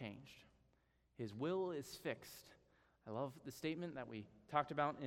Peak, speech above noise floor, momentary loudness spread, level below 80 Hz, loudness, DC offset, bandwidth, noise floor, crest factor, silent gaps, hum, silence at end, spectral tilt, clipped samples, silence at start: -22 dBFS; 34 dB; 18 LU; -78 dBFS; -45 LUFS; under 0.1%; 16 kHz; -78 dBFS; 24 dB; none; none; 0 s; -5.5 dB/octave; under 0.1%; 0 s